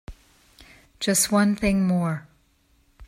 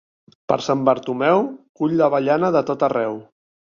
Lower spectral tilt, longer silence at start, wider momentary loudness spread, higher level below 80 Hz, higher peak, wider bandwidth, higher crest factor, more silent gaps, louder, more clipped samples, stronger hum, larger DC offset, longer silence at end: second, -4.5 dB/octave vs -6.5 dB/octave; second, 0.1 s vs 0.5 s; about the same, 10 LU vs 9 LU; first, -46 dBFS vs -64 dBFS; second, -6 dBFS vs 0 dBFS; first, 16 kHz vs 7.2 kHz; about the same, 18 dB vs 20 dB; second, none vs 1.69-1.75 s; about the same, -22 LUFS vs -20 LUFS; neither; neither; neither; second, 0.05 s vs 0.6 s